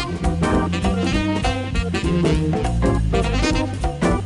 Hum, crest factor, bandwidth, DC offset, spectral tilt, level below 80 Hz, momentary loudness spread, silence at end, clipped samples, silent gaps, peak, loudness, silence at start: none; 14 dB; 11.5 kHz; under 0.1%; -6 dB/octave; -26 dBFS; 3 LU; 0 s; under 0.1%; none; -4 dBFS; -20 LUFS; 0 s